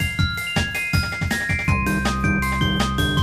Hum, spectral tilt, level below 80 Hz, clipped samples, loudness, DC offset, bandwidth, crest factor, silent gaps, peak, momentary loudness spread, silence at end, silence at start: none; -4.5 dB/octave; -30 dBFS; under 0.1%; -21 LUFS; under 0.1%; 15.5 kHz; 14 dB; none; -6 dBFS; 2 LU; 0 s; 0 s